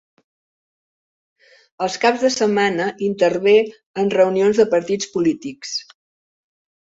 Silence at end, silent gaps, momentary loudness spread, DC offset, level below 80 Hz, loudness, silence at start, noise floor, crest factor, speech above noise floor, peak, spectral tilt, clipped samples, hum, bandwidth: 1.05 s; 3.86-3.94 s; 11 LU; under 0.1%; -64 dBFS; -18 LUFS; 1.8 s; under -90 dBFS; 18 dB; over 72 dB; -2 dBFS; -4.5 dB/octave; under 0.1%; none; 7.8 kHz